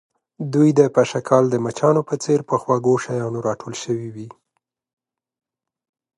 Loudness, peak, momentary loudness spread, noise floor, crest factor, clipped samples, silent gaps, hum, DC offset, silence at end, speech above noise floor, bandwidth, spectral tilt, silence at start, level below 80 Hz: -19 LUFS; -2 dBFS; 12 LU; -76 dBFS; 20 dB; under 0.1%; none; none; under 0.1%; 1.9 s; 57 dB; 11.5 kHz; -6.5 dB/octave; 0.4 s; -64 dBFS